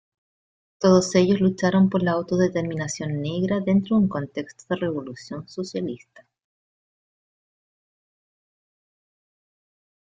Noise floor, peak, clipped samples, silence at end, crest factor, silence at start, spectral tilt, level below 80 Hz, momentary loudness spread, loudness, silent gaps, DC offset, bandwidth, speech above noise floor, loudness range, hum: under -90 dBFS; -4 dBFS; under 0.1%; 4.05 s; 20 dB; 0.8 s; -6.5 dB/octave; -60 dBFS; 14 LU; -23 LUFS; none; under 0.1%; 9 kHz; over 68 dB; 16 LU; none